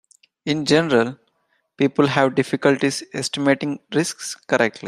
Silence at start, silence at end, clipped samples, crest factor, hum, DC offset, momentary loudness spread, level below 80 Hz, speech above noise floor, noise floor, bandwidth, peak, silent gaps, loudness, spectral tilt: 0.45 s; 0 s; under 0.1%; 18 dB; none; under 0.1%; 8 LU; -62 dBFS; 48 dB; -68 dBFS; 14 kHz; -2 dBFS; none; -20 LUFS; -4.5 dB/octave